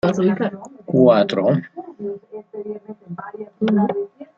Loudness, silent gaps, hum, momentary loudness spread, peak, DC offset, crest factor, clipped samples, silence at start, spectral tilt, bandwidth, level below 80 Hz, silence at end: -19 LUFS; none; none; 21 LU; -2 dBFS; under 0.1%; 18 dB; under 0.1%; 0.05 s; -8 dB/octave; 7.6 kHz; -62 dBFS; 0.15 s